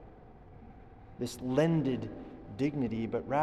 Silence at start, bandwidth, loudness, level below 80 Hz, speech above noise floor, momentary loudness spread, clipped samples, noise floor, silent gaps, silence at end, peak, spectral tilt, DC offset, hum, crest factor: 0 s; 12.5 kHz; -33 LUFS; -56 dBFS; 21 dB; 25 LU; under 0.1%; -53 dBFS; none; 0 s; -16 dBFS; -7 dB/octave; under 0.1%; none; 18 dB